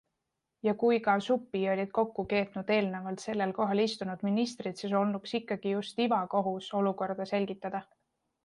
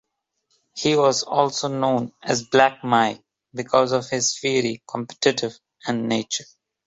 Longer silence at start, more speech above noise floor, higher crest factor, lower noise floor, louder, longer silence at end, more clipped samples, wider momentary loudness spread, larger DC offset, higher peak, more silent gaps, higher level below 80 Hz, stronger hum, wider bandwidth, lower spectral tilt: about the same, 0.65 s vs 0.75 s; about the same, 54 dB vs 52 dB; about the same, 18 dB vs 22 dB; first, -85 dBFS vs -73 dBFS; second, -31 LUFS vs -22 LUFS; first, 0.6 s vs 0.45 s; neither; second, 7 LU vs 13 LU; neither; second, -14 dBFS vs 0 dBFS; neither; second, -72 dBFS vs -64 dBFS; neither; first, 11 kHz vs 8 kHz; first, -6 dB/octave vs -3.5 dB/octave